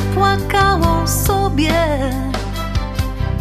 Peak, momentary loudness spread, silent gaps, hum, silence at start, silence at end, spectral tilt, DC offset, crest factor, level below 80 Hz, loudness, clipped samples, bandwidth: -2 dBFS; 8 LU; none; none; 0 s; 0 s; -5 dB/octave; under 0.1%; 14 dB; -24 dBFS; -17 LUFS; under 0.1%; 14 kHz